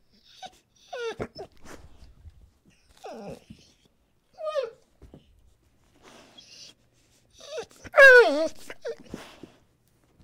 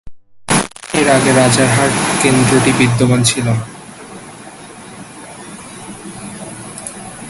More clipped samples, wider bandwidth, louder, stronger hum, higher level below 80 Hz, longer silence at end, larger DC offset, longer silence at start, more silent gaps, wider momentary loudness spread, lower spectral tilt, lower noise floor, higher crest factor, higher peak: neither; first, 16 kHz vs 12 kHz; second, -19 LUFS vs -12 LUFS; neither; second, -60 dBFS vs -44 dBFS; first, 1.3 s vs 0 s; neither; first, 0.45 s vs 0.05 s; neither; first, 32 LU vs 23 LU; second, -3 dB/octave vs -4.5 dB/octave; first, -66 dBFS vs -34 dBFS; first, 22 dB vs 16 dB; second, -4 dBFS vs 0 dBFS